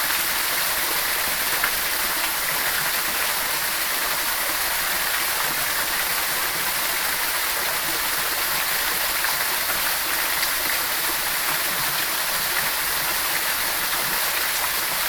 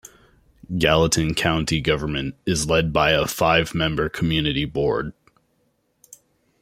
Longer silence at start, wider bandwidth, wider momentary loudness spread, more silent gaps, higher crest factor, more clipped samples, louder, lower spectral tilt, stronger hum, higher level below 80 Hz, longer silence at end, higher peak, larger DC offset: about the same, 0 s vs 0.05 s; first, over 20 kHz vs 16.5 kHz; second, 1 LU vs 7 LU; neither; about the same, 18 dB vs 20 dB; neither; about the same, -21 LUFS vs -21 LUFS; second, 0.5 dB/octave vs -4.5 dB/octave; neither; second, -50 dBFS vs -40 dBFS; second, 0 s vs 1.5 s; second, -6 dBFS vs -2 dBFS; neither